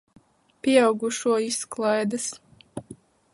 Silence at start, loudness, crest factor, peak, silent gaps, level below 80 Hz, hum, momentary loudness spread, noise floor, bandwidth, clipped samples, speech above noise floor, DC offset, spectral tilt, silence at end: 0.65 s; -24 LUFS; 20 dB; -6 dBFS; none; -68 dBFS; none; 21 LU; -49 dBFS; 11.5 kHz; under 0.1%; 26 dB; under 0.1%; -3.5 dB/octave; 0.4 s